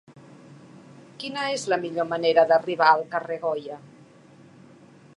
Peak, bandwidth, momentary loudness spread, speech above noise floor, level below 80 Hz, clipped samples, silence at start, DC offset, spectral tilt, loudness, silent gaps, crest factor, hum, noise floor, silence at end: -4 dBFS; 11 kHz; 15 LU; 28 dB; -78 dBFS; under 0.1%; 0.1 s; under 0.1%; -4 dB/octave; -23 LUFS; none; 22 dB; none; -51 dBFS; 1.3 s